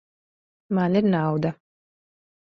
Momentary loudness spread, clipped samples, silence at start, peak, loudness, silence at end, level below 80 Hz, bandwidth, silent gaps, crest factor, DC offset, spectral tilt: 7 LU; under 0.1%; 0.7 s; -10 dBFS; -23 LUFS; 1 s; -64 dBFS; 6 kHz; none; 16 dB; under 0.1%; -9.5 dB/octave